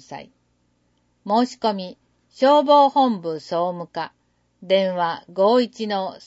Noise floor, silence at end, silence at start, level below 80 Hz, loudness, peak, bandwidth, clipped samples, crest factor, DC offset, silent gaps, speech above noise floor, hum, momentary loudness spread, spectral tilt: -66 dBFS; 0.1 s; 0.1 s; -72 dBFS; -20 LUFS; -4 dBFS; 8 kHz; under 0.1%; 18 dB; under 0.1%; none; 46 dB; 60 Hz at -50 dBFS; 18 LU; -5.5 dB/octave